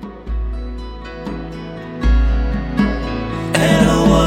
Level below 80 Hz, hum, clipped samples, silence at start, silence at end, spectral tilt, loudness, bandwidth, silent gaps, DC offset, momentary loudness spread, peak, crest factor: -22 dBFS; none; under 0.1%; 0 s; 0 s; -6 dB/octave; -18 LUFS; 13.5 kHz; none; under 0.1%; 17 LU; 0 dBFS; 16 dB